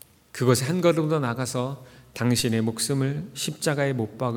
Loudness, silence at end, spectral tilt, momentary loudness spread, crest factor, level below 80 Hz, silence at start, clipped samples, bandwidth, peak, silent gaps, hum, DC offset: -25 LUFS; 0 s; -5 dB/octave; 9 LU; 18 dB; -60 dBFS; 0.35 s; under 0.1%; 18.5 kHz; -6 dBFS; none; none; under 0.1%